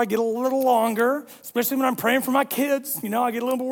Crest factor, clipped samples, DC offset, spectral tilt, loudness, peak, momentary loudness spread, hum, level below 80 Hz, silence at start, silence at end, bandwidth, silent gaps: 16 dB; under 0.1%; under 0.1%; -4 dB/octave; -23 LUFS; -6 dBFS; 5 LU; none; -72 dBFS; 0 s; 0 s; 18 kHz; none